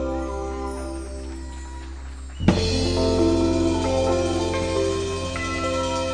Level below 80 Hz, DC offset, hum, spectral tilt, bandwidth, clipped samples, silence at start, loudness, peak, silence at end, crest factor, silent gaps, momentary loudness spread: -34 dBFS; 0.4%; none; -5.5 dB/octave; 10 kHz; under 0.1%; 0 s; -23 LUFS; -2 dBFS; 0 s; 20 dB; none; 16 LU